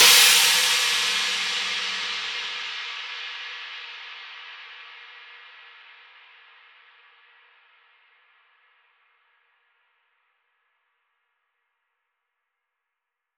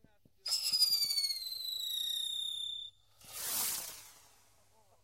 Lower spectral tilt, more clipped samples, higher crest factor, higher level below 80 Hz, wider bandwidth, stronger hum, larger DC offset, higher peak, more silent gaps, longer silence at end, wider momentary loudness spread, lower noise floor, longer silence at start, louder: about the same, 3 dB/octave vs 2.5 dB/octave; neither; about the same, 24 dB vs 22 dB; about the same, -78 dBFS vs -76 dBFS; first, over 20 kHz vs 16 kHz; neither; neither; first, -4 dBFS vs -16 dBFS; neither; first, 8 s vs 0.85 s; first, 27 LU vs 17 LU; first, -84 dBFS vs -69 dBFS; second, 0 s vs 0.45 s; first, -20 LUFS vs -33 LUFS